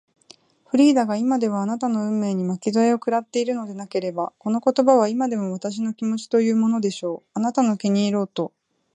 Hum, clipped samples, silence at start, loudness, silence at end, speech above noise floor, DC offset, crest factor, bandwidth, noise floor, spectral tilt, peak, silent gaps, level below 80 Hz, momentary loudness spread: none; under 0.1%; 0.75 s; -22 LUFS; 0.5 s; 32 dB; under 0.1%; 18 dB; 9.8 kHz; -53 dBFS; -6 dB/octave; -2 dBFS; none; -74 dBFS; 11 LU